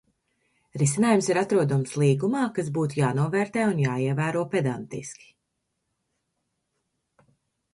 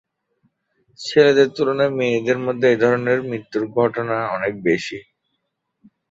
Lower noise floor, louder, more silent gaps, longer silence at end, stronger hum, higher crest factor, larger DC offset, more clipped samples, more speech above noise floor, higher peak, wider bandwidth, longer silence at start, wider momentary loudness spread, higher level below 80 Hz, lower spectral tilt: first, -79 dBFS vs -74 dBFS; second, -24 LUFS vs -19 LUFS; neither; first, 2.6 s vs 1.1 s; neither; about the same, 20 dB vs 18 dB; neither; neither; about the same, 55 dB vs 56 dB; second, -6 dBFS vs -2 dBFS; first, 11.5 kHz vs 8 kHz; second, 0.75 s vs 1 s; about the same, 10 LU vs 10 LU; about the same, -66 dBFS vs -62 dBFS; about the same, -6 dB/octave vs -6 dB/octave